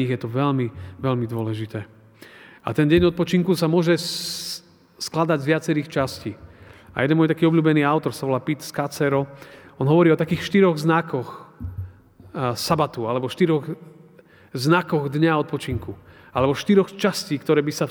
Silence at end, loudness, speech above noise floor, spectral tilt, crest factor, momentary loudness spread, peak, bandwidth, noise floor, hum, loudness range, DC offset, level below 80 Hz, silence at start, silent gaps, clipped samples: 0 s; -21 LUFS; 29 dB; -6 dB/octave; 18 dB; 16 LU; -4 dBFS; over 20 kHz; -50 dBFS; none; 3 LU; under 0.1%; -52 dBFS; 0 s; none; under 0.1%